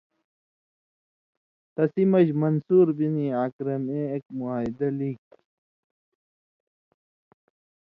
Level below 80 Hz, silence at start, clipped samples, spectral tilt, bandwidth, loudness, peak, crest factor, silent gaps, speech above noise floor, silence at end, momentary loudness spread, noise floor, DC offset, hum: -68 dBFS; 1.8 s; under 0.1%; -11.5 dB/octave; 4.4 kHz; -25 LUFS; -8 dBFS; 18 dB; 3.53-3.59 s; over 66 dB; 2.7 s; 11 LU; under -90 dBFS; under 0.1%; none